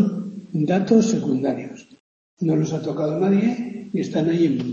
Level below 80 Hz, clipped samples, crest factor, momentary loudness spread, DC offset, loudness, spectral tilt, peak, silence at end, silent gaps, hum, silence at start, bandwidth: -64 dBFS; under 0.1%; 16 dB; 12 LU; under 0.1%; -21 LUFS; -7 dB/octave; -4 dBFS; 0 s; 2.00-2.37 s; none; 0 s; 7.4 kHz